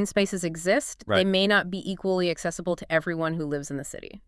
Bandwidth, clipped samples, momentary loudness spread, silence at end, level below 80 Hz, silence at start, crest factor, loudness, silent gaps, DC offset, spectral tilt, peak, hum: 12 kHz; under 0.1%; 10 LU; 0.1 s; -54 dBFS; 0 s; 18 dB; -26 LUFS; none; under 0.1%; -4.5 dB/octave; -8 dBFS; none